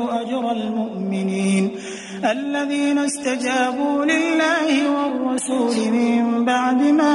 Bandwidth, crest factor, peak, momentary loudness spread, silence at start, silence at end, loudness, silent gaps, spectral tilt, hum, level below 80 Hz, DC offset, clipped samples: 11.5 kHz; 14 dB; -6 dBFS; 6 LU; 0 s; 0 s; -20 LUFS; none; -4.5 dB/octave; none; -66 dBFS; under 0.1%; under 0.1%